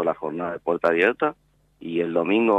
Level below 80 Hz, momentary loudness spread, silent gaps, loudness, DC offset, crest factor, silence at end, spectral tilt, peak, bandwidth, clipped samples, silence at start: -66 dBFS; 9 LU; none; -23 LUFS; under 0.1%; 16 dB; 0 s; -7 dB/octave; -6 dBFS; 8.2 kHz; under 0.1%; 0 s